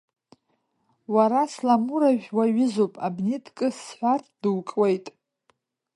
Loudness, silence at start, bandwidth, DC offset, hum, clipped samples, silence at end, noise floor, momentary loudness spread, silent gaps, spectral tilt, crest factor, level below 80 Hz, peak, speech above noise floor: -24 LUFS; 1.1 s; 11.5 kHz; under 0.1%; none; under 0.1%; 0.85 s; -72 dBFS; 7 LU; none; -6.5 dB/octave; 18 dB; -76 dBFS; -6 dBFS; 49 dB